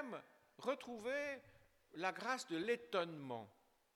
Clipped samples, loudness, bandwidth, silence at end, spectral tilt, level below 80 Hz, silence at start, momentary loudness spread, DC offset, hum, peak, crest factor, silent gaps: under 0.1%; -44 LUFS; 17.5 kHz; 0.45 s; -4 dB/octave; -84 dBFS; 0 s; 12 LU; under 0.1%; none; -24 dBFS; 22 dB; none